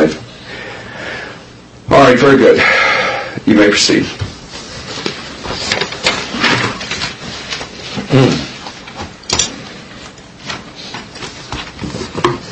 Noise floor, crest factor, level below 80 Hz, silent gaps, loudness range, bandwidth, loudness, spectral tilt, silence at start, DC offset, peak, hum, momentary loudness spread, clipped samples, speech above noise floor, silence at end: -36 dBFS; 14 dB; -40 dBFS; none; 11 LU; 10 kHz; -13 LUFS; -4 dB/octave; 0 s; under 0.1%; 0 dBFS; none; 20 LU; 0.1%; 27 dB; 0 s